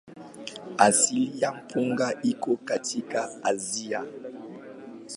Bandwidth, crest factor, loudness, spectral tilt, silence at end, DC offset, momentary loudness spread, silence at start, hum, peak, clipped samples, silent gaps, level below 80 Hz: 11.5 kHz; 26 dB; -26 LUFS; -3 dB/octave; 0 s; under 0.1%; 21 LU; 0.05 s; none; -2 dBFS; under 0.1%; none; -74 dBFS